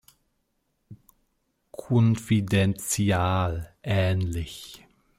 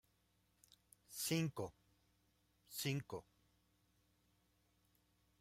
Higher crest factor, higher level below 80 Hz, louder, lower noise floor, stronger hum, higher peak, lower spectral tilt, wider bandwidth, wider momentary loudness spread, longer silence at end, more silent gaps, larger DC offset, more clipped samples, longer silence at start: second, 16 dB vs 22 dB; first, -50 dBFS vs -78 dBFS; first, -25 LUFS vs -44 LUFS; second, -74 dBFS vs -79 dBFS; second, none vs 60 Hz at -80 dBFS; first, -10 dBFS vs -28 dBFS; about the same, -5.5 dB/octave vs -4.5 dB/octave; about the same, 16 kHz vs 16 kHz; first, 18 LU vs 14 LU; second, 0.45 s vs 2.2 s; neither; neither; neither; second, 0.9 s vs 1.1 s